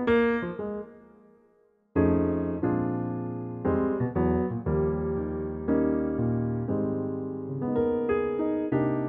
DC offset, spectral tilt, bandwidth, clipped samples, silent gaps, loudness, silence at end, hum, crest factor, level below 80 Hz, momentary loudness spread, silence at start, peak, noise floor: under 0.1%; -11 dB/octave; 4.6 kHz; under 0.1%; none; -28 LUFS; 0 s; none; 16 dB; -46 dBFS; 8 LU; 0 s; -12 dBFS; -64 dBFS